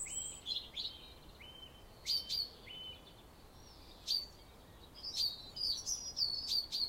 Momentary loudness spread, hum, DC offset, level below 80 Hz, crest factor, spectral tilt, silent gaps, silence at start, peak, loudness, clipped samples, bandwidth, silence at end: 23 LU; none; under 0.1%; -62 dBFS; 20 dB; 0 dB/octave; none; 0 s; -24 dBFS; -38 LUFS; under 0.1%; 16 kHz; 0 s